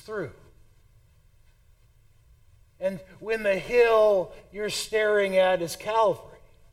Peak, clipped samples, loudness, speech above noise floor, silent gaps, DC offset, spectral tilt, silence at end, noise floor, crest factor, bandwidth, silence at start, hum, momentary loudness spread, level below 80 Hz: -10 dBFS; under 0.1%; -25 LUFS; 34 dB; none; under 0.1%; -3.5 dB/octave; 0.45 s; -58 dBFS; 18 dB; 16.5 kHz; 0.1 s; none; 15 LU; -56 dBFS